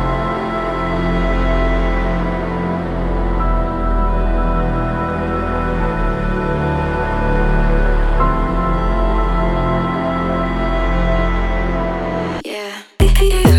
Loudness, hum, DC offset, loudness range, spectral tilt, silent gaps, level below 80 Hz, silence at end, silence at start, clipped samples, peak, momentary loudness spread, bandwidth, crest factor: -18 LUFS; none; under 0.1%; 2 LU; -6.5 dB/octave; none; -18 dBFS; 0 s; 0 s; under 0.1%; 0 dBFS; 3 LU; 13 kHz; 16 dB